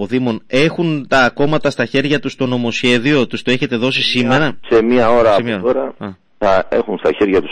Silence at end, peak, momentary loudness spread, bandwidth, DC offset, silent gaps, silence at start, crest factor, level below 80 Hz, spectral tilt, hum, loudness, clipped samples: 0 s; -2 dBFS; 6 LU; 10 kHz; under 0.1%; none; 0 s; 14 dB; -40 dBFS; -5.5 dB/octave; none; -15 LUFS; under 0.1%